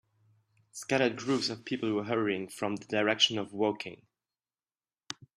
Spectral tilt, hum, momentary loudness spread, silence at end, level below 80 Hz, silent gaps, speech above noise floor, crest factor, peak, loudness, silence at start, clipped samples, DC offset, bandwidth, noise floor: -3.5 dB/octave; none; 17 LU; 0.25 s; -76 dBFS; none; over 59 dB; 22 dB; -10 dBFS; -30 LUFS; 0.75 s; under 0.1%; under 0.1%; 14.5 kHz; under -90 dBFS